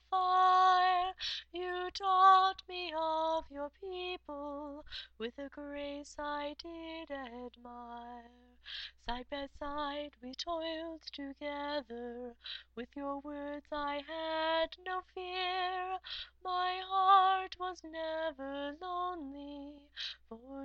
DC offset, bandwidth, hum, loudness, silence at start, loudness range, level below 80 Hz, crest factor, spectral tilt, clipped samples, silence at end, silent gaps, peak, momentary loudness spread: under 0.1%; 8.2 kHz; none; -35 LUFS; 0.1 s; 12 LU; -62 dBFS; 22 dB; -3 dB/octave; under 0.1%; 0 s; none; -14 dBFS; 19 LU